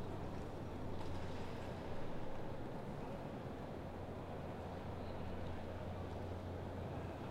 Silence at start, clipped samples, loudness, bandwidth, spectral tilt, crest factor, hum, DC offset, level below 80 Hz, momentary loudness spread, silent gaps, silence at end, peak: 0 s; under 0.1%; -48 LUFS; 12 kHz; -7.5 dB/octave; 12 dB; none; under 0.1%; -54 dBFS; 1 LU; none; 0 s; -32 dBFS